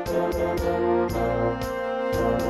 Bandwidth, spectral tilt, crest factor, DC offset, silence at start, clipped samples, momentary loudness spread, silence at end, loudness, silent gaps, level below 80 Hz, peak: 15.5 kHz; -6.5 dB/octave; 14 dB; under 0.1%; 0 s; under 0.1%; 4 LU; 0 s; -25 LUFS; none; -38 dBFS; -12 dBFS